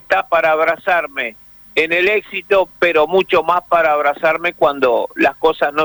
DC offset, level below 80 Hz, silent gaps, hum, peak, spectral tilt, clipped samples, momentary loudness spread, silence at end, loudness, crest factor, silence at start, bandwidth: under 0.1%; -52 dBFS; none; none; -4 dBFS; -5 dB/octave; under 0.1%; 4 LU; 0 s; -15 LUFS; 12 dB; 0.1 s; over 20 kHz